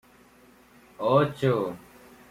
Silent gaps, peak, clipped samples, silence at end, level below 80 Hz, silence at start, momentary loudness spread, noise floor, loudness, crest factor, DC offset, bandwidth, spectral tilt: none; -8 dBFS; under 0.1%; 0.55 s; -62 dBFS; 1 s; 12 LU; -56 dBFS; -25 LUFS; 20 dB; under 0.1%; 16 kHz; -7.5 dB/octave